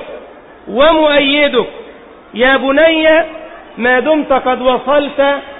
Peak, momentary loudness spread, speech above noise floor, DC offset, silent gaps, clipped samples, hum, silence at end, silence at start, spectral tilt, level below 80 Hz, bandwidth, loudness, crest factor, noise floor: 0 dBFS; 17 LU; 25 dB; 0.6%; none; under 0.1%; none; 0 s; 0 s; -9 dB/octave; -42 dBFS; 4 kHz; -11 LUFS; 12 dB; -36 dBFS